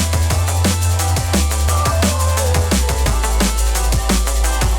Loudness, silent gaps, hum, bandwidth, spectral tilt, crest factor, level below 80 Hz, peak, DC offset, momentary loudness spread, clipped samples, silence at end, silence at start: -16 LUFS; none; none; over 20 kHz; -4 dB/octave; 12 dB; -20 dBFS; -2 dBFS; under 0.1%; 2 LU; under 0.1%; 0 s; 0 s